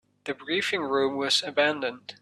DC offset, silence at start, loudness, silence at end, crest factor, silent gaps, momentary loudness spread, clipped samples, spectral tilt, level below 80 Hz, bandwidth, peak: under 0.1%; 0.25 s; -26 LUFS; 0.1 s; 18 dB; none; 11 LU; under 0.1%; -2.5 dB/octave; -72 dBFS; 13 kHz; -8 dBFS